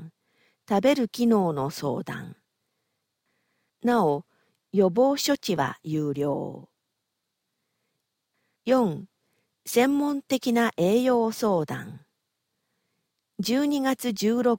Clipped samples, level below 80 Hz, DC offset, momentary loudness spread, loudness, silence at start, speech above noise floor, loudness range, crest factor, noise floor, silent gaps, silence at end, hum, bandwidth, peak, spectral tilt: under 0.1%; -68 dBFS; under 0.1%; 14 LU; -25 LUFS; 0 s; 57 dB; 6 LU; 18 dB; -81 dBFS; none; 0 s; none; 17 kHz; -10 dBFS; -5.5 dB/octave